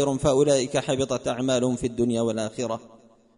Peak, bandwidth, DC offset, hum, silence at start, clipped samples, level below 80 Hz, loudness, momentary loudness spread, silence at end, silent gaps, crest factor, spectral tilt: -8 dBFS; 11 kHz; under 0.1%; none; 0 s; under 0.1%; -50 dBFS; -24 LUFS; 9 LU; 0.5 s; none; 16 dB; -5 dB/octave